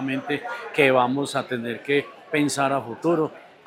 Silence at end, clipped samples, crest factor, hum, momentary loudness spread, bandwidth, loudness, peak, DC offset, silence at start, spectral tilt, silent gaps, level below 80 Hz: 0.2 s; under 0.1%; 20 dB; none; 10 LU; 16 kHz; -23 LUFS; -4 dBFS; under 0.1%; 0 s; -4.5 dB/octave; none; -76 dBFS